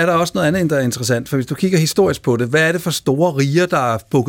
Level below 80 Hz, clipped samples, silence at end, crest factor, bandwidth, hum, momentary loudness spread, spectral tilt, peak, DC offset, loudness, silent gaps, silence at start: -50 dBFS; under 0.1%; 0 s; 14 dB; 17 kHz; none; 4 LU; -5.5 dB/octave; -2 dBFS; under 0.1%; -16 LUFS; none; 0 s